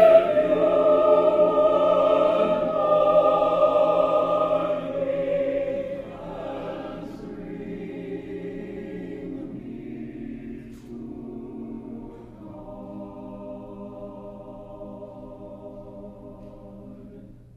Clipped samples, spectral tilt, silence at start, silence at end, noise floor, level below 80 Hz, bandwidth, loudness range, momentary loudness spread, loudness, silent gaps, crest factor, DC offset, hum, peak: under 0.1%; -7.5 dB/octave; 0 s; 0.2 s; -45 dBFS; -52 dBFS; 5.2 kHz; 20 LU; 22 LU; -22 LUFS; none; 20 dB; under 0.1%; none; -4 dBFS